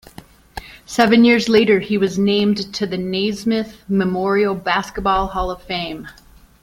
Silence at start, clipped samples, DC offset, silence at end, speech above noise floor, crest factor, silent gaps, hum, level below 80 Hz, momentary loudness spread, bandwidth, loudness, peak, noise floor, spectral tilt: 0.55 s; under 0.1%; under 0.1%; 0.5 s; 26 dB; 16 dB; none; none; -40 dBFS; 14 LU; 16 kHz; -18 LUFS; -2 dBFS; -43 dBFS; -5.5 dB/octave